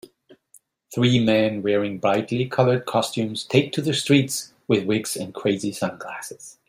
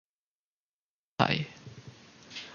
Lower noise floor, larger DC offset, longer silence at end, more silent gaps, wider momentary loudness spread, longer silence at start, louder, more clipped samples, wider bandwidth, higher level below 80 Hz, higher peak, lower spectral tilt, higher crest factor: second, -57 dBFS vs under -90 dBFS; neither; first, 0.15 s vs 0 s; neither; second, 10 LU vs 23 LU; second, 0.9 s vs 1.2 s; first, -22 LUFS vs -31 LUFS; neither; first, 16 kHz vs 7.2 kHz; about the same, -62 dBFS vs -66 dBFS; first, -2 dBFS vs -6 dBFS; about the same, -5 dB/octave vs -5.5 dB/octave; second, 20 dB vs 30 dB